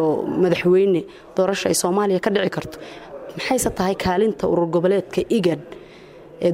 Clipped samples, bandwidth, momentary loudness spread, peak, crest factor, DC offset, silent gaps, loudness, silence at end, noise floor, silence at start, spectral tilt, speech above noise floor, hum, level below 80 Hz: under 0.1%; 16 kHz; 18 LU; -6 dBFS; 14 dB; under 0.1%; none; -20 LUFS; 0 s; -43 dBFS; 0 s; -5 dB/octave; 23 dB; none; -48 dBFS